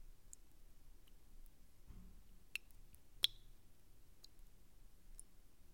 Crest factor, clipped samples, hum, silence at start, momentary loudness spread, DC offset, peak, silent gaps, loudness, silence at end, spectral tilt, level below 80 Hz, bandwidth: 40 dB; under 0.1%; none; 0 s; 29 LU; under 0.1%; -14 dBFS; none; -43 LUFS; 0 s; 0 dB/octave; -62 dBFS; 16.5 kHz